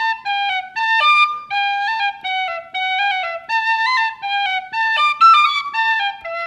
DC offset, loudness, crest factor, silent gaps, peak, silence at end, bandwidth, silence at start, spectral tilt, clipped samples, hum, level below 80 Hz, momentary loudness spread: under 0.1%; -16 LUFS; 16 dB; none; -2 dBFS; 0 s; 12 kHz; 0 s; 1 dB/octave; under 0.1%; none; -66 dBFS; 9 LU